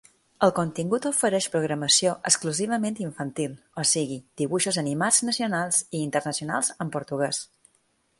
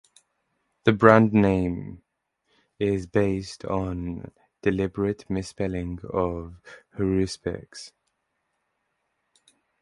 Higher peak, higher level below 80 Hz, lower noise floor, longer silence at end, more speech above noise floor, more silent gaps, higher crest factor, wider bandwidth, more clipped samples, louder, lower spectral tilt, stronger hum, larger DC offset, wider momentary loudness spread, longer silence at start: second, -4 dBFS vs 0 dBFS; second, -68 dBFS vs -46 dBFS; second, -68 dBFS vs -77 dBFS; second, 0.75 s vs 1.95 s; second, 43 dB vs 53 dB; neither; about the same, 22 dB vs 26 dB; about the same, 12 kHz vs 11.5 kHz; neither; about the same, -25 LUFS vs -24 LUFS; second, -3 dB/octave vs -7 dB/octave; neither; neither; second, 11 LU vs 20 LU; second, 0.4 s vs 0.85 s